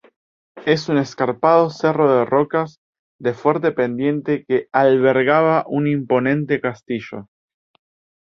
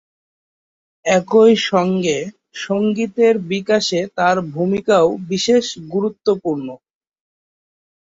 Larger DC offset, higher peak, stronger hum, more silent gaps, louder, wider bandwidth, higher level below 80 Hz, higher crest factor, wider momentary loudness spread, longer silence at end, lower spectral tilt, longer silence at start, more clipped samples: neither; about the same, -2 dBFS vs -2 dBFS; neither; first, 2.78-2.93 s, 2.99-3.19 s vs none; about the same, -18 LUFS vs -17 LUFS; about the same, 7.2 kHz vs 7.8 kHz; about the same, -62 dBFS vs -60 dBFS; about the same, 18 dB vs 16 dB; about the same, 11 LU vs 11 LU; second, 1.05 s vs 1.3 s; first, -7.5 dB/octave vs -5 dB/octave; second, 0.55 s vs 1.05 s; neither